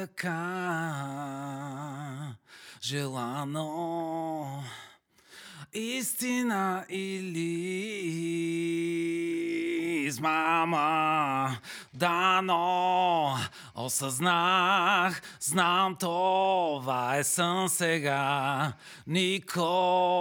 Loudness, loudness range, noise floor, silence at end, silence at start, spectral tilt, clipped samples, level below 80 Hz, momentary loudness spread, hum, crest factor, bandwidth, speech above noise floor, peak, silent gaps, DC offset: -29 LUFS; 9 LU; -57 dBFS; 0 s; 0 s; -4 dB/octave; under 0.1%; -80 dBFS; 13 LU; none; 20 dB; over 20 kHz; 28 dB; -10 dBFS; none; under 0.1%